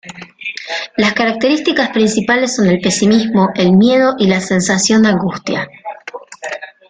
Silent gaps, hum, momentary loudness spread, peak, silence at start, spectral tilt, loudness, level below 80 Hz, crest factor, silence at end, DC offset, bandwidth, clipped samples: none; none; 15 LU; -2 dBFS; 0.05 s; -4.5 dB/octave; -13 LUFS; -50 dBFS; 12 dB; 0.25 s; under 0.1%; 9.6 kHz; under 0.1%